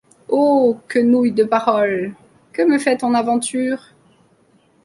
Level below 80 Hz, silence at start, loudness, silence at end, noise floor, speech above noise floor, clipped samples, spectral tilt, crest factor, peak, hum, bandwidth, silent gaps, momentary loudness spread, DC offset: -64 dBFS; 0.3 s; -17 LUFS; 1.05 s; -56 dBFS; 40 dB; under 0.1%; -5 dB/octave; 16 dB; -2 dBFS; none; 11.5 kHz; none; 9 LU; under 0.1%